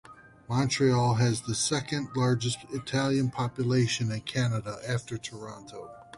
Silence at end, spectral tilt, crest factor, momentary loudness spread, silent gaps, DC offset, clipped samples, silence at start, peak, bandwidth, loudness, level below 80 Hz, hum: 0 s; -5 dB/octave; 16 dB; 14 LU; none; under 0.1%; under 0.1%; 0.1 s; -14 dBFS; 11.5 kHz; -28 LUFS; -58 dBFS; none